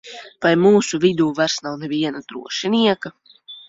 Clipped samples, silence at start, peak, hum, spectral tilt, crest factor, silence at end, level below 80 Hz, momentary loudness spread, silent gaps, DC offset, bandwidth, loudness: under 0.1%; 0.05 s; -2 dBFS; none; -4.5 dB/octave; 16 dB; 0.1 s; -62 dBFS; 17 LU; none; under 0.1%; 8 kHz; -19 LUFS